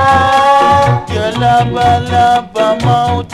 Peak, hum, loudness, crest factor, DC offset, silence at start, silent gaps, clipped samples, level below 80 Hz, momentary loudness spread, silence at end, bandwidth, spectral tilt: 0 dBFS; none; -10 LUFS; 10 dB; under 0.1%; 0 s; none; under 0.1%; -34 dBFS; 5 LU; 0 s; 13.5 kHz; -5.5 dB/octave